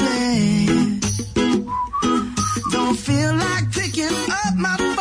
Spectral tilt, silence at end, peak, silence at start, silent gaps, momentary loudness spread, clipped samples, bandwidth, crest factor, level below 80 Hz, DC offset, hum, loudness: -4.5 dB/octave; 0 s; -8 dBFS; 0 s; none; 4 LU; under 0.1%; 10.5 kHz; 12 dB; -42 dBFS; under 0.1%; none; -20 LUFS